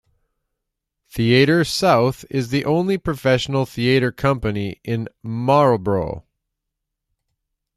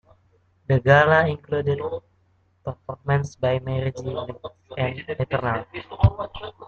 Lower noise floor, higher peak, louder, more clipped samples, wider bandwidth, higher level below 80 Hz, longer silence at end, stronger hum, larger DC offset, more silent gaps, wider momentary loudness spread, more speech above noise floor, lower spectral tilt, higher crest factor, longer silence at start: first, -80 dBFS vs -63 dBFS; about the same, -2 dBFS vs -2 dBFS; first, -19 LUFS vs -23 LUFS; neither; first, 14.5 kHz vs 7 kHz; about the same, -46 dBFS vs -44 dBFS; first, 1.55 s vs 0 s; neither; neither; neither; second, 11 LU vs 19 LU; first, 62 dB vs 40 dB; second, -6 dB/octave vs -7.5 dB/octave; about the same, 18 dB vs 22 dB; first, 1.15 s vs 0.7 s